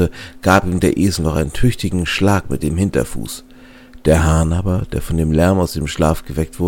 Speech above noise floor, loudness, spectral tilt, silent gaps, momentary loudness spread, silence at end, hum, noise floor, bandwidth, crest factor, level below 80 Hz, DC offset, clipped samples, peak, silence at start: 24 dB; -17 LUFS; -6 dB/octave; none; 7 LU; 0 s; none; -40 dBFS; 17 kHz; 16 dB; -28 dBFS; under 0.1%; under 0.1%; 0 dBFS; 0 s